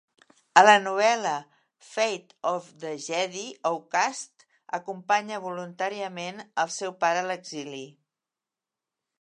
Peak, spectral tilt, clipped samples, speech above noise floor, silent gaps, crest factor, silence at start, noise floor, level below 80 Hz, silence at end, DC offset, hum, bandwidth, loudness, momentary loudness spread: -2 dBFS; -2.5 dB/octave; under 0.1%; 63 dB; none; 26 dB; 0.55 s; -90 dBFS; -86 dBFS; 1.3 s; under 0.1%; none; 11 kHz; -26 LUFS; 17 LU